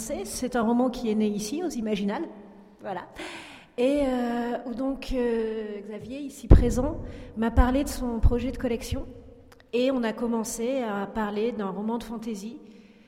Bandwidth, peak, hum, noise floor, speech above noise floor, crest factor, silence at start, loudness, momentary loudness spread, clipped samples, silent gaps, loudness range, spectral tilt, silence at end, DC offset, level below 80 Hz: 16 kHz; -4 dBFS; none; -50 dBFS; 24 dB; 24 dB; 0 s; -28 LUFS; 14 LU; under 0.1%; none; 4 LU; -6 dB/octave; 0.25 s; under 0.1%; -32 dBFS